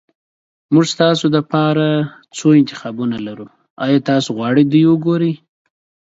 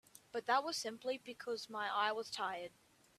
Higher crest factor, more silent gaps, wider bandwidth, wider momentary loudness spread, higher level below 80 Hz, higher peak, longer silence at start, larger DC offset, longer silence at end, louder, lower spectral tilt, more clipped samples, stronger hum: about the same, 16 dB vs 20 dB; first, 3.70-3.76 s vs none; second, 8 kHz vs 15 kHz; about the same, 11 LU vs 10 LU; first, -60 dBFS vs -86 dBFS; first, 0 dBFS vs -20 dBFS; first, 0.7 s vs 0.15 s; neither; first, 0.8 s vs 0.5 s; first, -15 LUFS vs -40 LUFS; first, -6.5 dB/octave vs -1.5 dB/octave; neither; neither